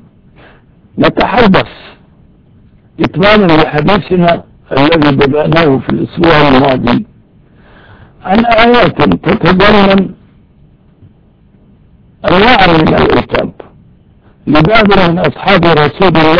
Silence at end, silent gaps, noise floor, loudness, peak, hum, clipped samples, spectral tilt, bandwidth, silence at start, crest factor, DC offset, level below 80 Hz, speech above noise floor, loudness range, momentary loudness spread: 0 s; none; -44 dBFS; -8 LUFS; 0 dBFS; none; 1%; -8 dB/octave; 5.4 kHz; 0 s; 10 dB; under 0.1%; -30 dBFS; 37 dB; 3 LU; 10 LU